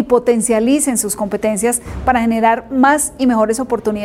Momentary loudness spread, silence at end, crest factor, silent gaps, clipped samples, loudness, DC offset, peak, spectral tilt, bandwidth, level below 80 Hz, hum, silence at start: 5 LU; 0 s; 14 dB; none; under 0.1%; -15 LUFS; under 0.1%; 0 dBFS; -4 dB/octave; 16 kHz; -38 dBFS; none; 0 s